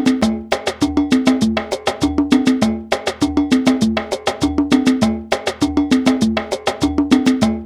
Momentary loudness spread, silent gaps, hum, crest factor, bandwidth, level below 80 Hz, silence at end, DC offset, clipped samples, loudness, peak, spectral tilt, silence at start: 6 LU; none; none; 16 dB; 14 kHz; -36 dBFS; 0 s; under 0.1%; under 0.1%; -17 LUFS; 0 dBFS; -5 dB/octave; 0 s